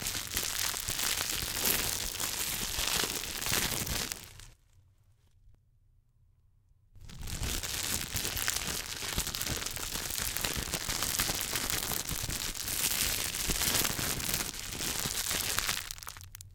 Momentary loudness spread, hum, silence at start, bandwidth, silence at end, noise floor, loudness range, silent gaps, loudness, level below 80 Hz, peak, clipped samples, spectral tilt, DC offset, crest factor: 7 LU; none; 0 s; 19 kHz; 0 s; -66 dBFS; 8 LU; none; -31 LUFS; -48 dBFS; -8 dBFS; under 0.1%; -1 dB/octave; under 0.1%; 28 dB